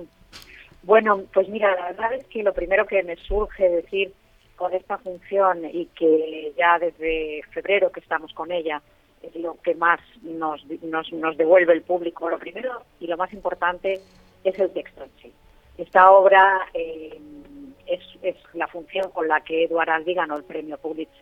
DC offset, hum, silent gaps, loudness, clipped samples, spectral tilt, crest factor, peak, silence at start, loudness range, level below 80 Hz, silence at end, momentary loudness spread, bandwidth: under 0.1%; none; none; -22 LUFS; under 0.1%; -6 dB/octave; 22 dB; 0 dBFS; 0 s; 8 LU; -48 dBFS; 0.2 s; 15 LU; 6.4 kHz